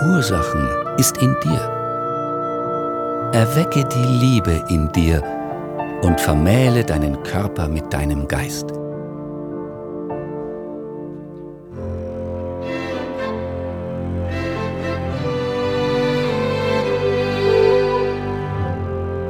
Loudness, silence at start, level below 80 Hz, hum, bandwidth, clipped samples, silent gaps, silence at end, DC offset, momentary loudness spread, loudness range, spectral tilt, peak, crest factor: -20 LUFS; 0 s; -34 dBFS; none; 19 kHz; under 0.1%; none; 0 s; under 0.1%; 13 LU; 10 LU; -6 dB/octave; 0 dBFS; 20 dB